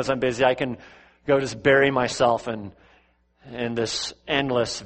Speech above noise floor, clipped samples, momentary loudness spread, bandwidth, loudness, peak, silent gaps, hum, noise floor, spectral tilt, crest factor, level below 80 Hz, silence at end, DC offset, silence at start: 38 dB; under 0.1%; 17 LU; 8.8 kHz; -23 LUFS; -4 dBFS; none; none; -61 dBFS; -4.5 dB/octave; 20 dB; -54 dBFS; 0 s; under 0.1%; 0 s